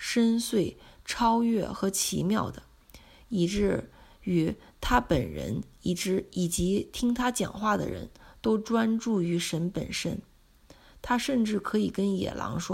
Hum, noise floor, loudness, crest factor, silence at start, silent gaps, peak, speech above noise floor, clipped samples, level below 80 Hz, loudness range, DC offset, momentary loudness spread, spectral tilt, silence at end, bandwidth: none; -57 dBFS; -28 LUFS; 20 dB; 0 s; none; -8 dBFS; 29 dB; under 0.1%; -46 dBFS; 2 LU; under 0.1%; 10 LU; -5 dB/octave; 0 s; 16 kHz